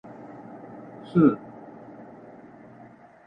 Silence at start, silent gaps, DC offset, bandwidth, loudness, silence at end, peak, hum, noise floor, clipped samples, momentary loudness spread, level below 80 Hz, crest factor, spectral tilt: 0.5 s; none; under 0.1%; 5.2 kHz; -23 LUFS; 1.9 s; -6 dBFS; none; -50 dBFS; under 0.1%; 27 LU; -66 dBFS; 24 dB; -11 dB/octave